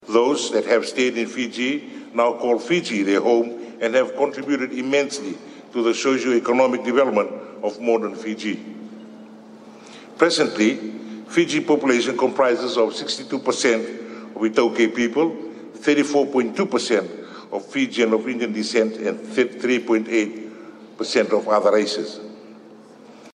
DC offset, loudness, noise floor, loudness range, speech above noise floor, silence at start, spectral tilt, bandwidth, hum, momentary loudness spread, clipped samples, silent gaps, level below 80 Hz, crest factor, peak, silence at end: under 0.1%; -21 LUFS; -44 dBFS; 3 LU; 24 dB; 0.05 s; -4 dB/octave; 11 kHz; none; 15 LU; under 0.1%; none; -74 dBFS; 22 dB; 0 dBFS; 0.05 s